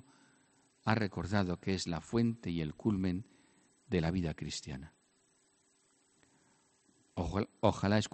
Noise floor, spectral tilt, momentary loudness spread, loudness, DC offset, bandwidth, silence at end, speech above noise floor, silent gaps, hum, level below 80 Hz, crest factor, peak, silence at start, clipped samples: -72 dBFS; -6 dB/octave; 10 LU; -35 LUFS; under 0.1%; 8.4 kHz; 0.05 s; 38 dB; none; none; -58 dBFS; 24 dB; -12 dBFS; 0.85 s; under 0.1%